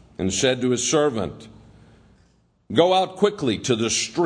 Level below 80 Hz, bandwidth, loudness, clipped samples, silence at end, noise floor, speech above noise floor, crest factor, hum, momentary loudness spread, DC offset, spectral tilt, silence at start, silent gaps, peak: -54 dBFS; 10.5 kHz; -21 LUFS; under 0.1%; 0 s; -60 dBFS; 39 dB; 20 dB; none; 6 LU; under 0.1%; -3.5 dB/octave; 0.2 s; none; -2 dBFS